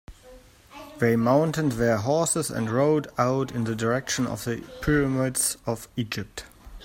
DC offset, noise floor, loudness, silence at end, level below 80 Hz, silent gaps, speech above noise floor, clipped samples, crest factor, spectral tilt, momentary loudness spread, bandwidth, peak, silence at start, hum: under 0.1%; -50 dBFS; -25 LUFS; 0 s; -48 dBFS; none; 25 dB; under 0.1%; 18 dB; -5 dB/octave; 10 LU; 16.5 kHz; -8 dBFS; 0.1 s; none